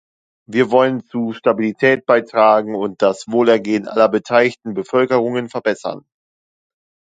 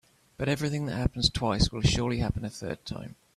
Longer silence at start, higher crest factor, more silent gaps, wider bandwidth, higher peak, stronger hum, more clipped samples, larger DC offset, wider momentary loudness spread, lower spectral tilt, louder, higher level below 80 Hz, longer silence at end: about the same, 0.5 s vs 0.4 s; about the same, 16 dB vs 20 dB; neither; second, 9.2 kHz vs 14 kHz; first, 0 dBFS vs -8 dBFS; neither; neither; neither; second, 9 LU vs 12 LU; about the same, -6 dB/octave vs -5 dB/octave; first, -16 LUFS vs -29 LUFS; second, -66 dBFS vs -40 dBFS; first, 1.2 s vs 0.25 s